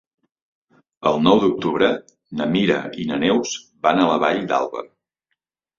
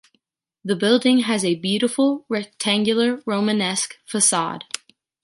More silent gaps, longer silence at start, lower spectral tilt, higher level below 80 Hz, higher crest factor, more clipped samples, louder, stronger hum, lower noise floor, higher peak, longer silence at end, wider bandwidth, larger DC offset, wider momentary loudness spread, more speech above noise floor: neither; first, 1 s vs 0.65 s; first, -5 dB/octave vs -3 dB/octave; first, -56 dBFS vs -70 dBFS; about the same, 20 dB vs 18 dB; neither; about the same, -20 LUFS vs -20 LUFS; neither; first, -77 dBFS vs -69 dBFS; about the same, -2 dBFS vs -4 dBFS; first, 0.95 s vs 0.65 s; second, 7.6 kHz vs 11.5 kHz; neither; about the same, 12 LU vs 10 LU; first, 58 dB vs 49 dB